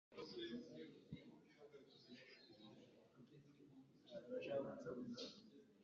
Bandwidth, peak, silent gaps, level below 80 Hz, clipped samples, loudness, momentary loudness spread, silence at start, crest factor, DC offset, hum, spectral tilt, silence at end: 7.2 kHz; -34 dBFS; none; -88 dBFS; under 0.1%; -54 LUFS; 19 LU; 0.1 s; 22 dB; under 0.1%; none; -4.5 dB/octave; 0 s